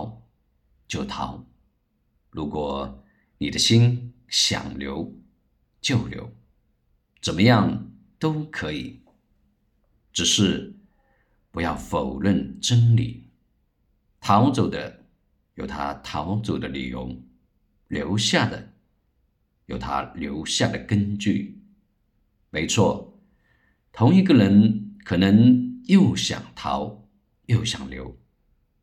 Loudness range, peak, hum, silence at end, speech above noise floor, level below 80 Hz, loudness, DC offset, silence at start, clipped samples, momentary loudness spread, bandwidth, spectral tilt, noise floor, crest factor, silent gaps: 8 LU; -4 dBFS; none; 0.7 s; 47 dB; -50 dBFS; -22 LUFS; under 0.1%; 0 s; under 0.1%; 18 LU; 13 kHz; -5 dB/octave; -69 dBFS; 20 dB; none